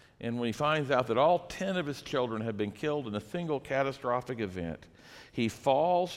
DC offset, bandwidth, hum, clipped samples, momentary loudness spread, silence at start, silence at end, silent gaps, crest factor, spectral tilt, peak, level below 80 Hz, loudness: under 0.1%; 15.5 kHz; none; under 0.1%; 11 LU; 0.2 s; 0 s; none; 18 dB; -6 dB/octave; -12 dBFS; -62 dBFS; -31 LUFS